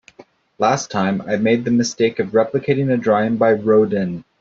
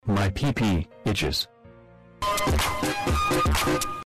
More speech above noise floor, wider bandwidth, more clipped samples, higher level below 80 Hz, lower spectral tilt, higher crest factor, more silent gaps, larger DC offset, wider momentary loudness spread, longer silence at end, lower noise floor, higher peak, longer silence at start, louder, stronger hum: first, 31 dB vs 26 dB; second, 7.6 kHz vs 15 kHz; neither; second, -58 dBFS vs -34 dBFS; first, -6 dB/octave vs -4.5 dB/octave; first, 16 dB vs 8 dB; neither; neither; about the same, 5 LU vs 5 LU; first, 0.2 s vs 0 s; about the same, -48 dBFS vs -50 dBFS; first, -2 dBFS vs -18 dBFS; first, 0.6 s vs 0.05 s; first, -18 LUFS vs -25 LUFS; neither